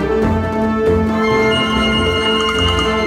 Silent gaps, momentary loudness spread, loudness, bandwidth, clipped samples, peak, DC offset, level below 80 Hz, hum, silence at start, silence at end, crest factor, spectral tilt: none; 3 LU; -15 LUFS; 13.5 kHz; under 0.1%; -4 dBFS; under 0.1%; -28 dBFS; none; 0 s; 0 s; 12 dB; -5 dB/octave